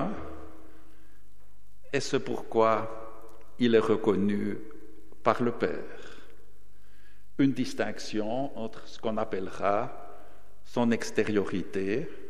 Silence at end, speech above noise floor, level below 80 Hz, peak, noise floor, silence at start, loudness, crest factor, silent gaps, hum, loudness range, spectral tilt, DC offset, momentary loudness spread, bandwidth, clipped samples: 0 s; 31 dB; -60 dBFS; -6 dBFS; -60 dBFS; 0 s; -29 LUFS; 24 dB; none; none; 5 LU; -6 dB/octave; 2%; 20 LU; 14 kHz; under 0.1%